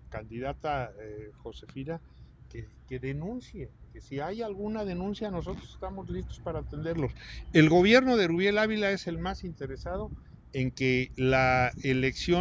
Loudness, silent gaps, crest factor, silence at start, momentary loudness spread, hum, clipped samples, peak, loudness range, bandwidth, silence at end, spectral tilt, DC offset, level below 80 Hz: -29 LUFS; none; 22 dB; 0.1 s; 21 LU; none; under 0.1%; -8 dBFS; 13 LU; 8 kHz; 0 s; -6.5 dB/octave; under 0.1%; -46 dBFS